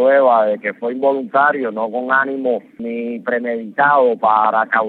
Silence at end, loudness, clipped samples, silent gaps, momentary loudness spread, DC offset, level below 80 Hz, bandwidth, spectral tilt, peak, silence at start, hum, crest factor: 0 s; -16 LUFS; under 0.1%; none; 10 LU; under 0.1%; -76 dBFS; 4.3 kHz; -8 dB/octave; -2 dBFS; 0 s; none; 14 dB